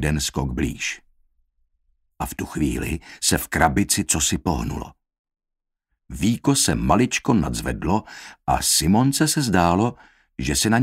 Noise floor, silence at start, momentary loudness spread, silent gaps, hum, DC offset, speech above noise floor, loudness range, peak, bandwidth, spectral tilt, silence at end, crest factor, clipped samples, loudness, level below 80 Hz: -77 dBFS; 0 s; 13 LU; 5.19-5.25 s; none; under 0.1%; 56 dB; 5 LU; 0 dBFS; 16 kHz; -4 dB/octave; 0 s; 22 dB; under 0.1%; -21 LUFS; -36 dBFS